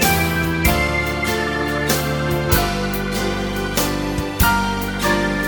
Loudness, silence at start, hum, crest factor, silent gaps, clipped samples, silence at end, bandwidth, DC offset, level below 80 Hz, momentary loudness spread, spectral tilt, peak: -19 LUFS; 0 s; none; 18 dB; none; under 0.1%; 0 s; 19.5 kHz; under 0.1%; -28 dBFS; 5 LU; -4.5 dB/octave; -2 dBFS